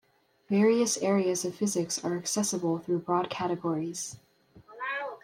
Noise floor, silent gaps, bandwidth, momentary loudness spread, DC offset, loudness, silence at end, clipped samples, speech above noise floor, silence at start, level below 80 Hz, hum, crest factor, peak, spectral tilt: -55 dBFS; none; 16 kHz; 10 LU; under 0.1%; -29 LUFS; 0.05 s; under 0.1%; 27 dB; 0.5 s; -74 dBFS; none; 16 dB; -14 dBFS; -4 dB/octave